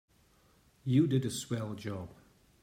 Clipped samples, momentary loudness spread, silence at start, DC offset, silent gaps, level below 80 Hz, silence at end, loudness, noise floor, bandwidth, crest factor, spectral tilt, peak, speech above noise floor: under 0.1%; 15 LU; 0.85 s; under 0.1%; none; -68 dBFS; 0.5 s; -33 LUFS; -66 dBFS; 16 kHz; 18 dB; -6.5 dB/octave; -16 dBFS; 35 dB